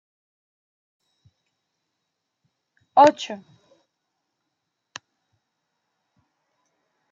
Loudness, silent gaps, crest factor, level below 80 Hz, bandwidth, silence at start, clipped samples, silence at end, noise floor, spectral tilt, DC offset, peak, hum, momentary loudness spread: -17 LUFS; none; 26 dB; -80 dBFS; 7.6 kHz; 2.95 s; under 0.1%; 3.75 s; -80 dBFS; -4 dB/octave; under 0.1%; -2 dBFS; none; 27 LU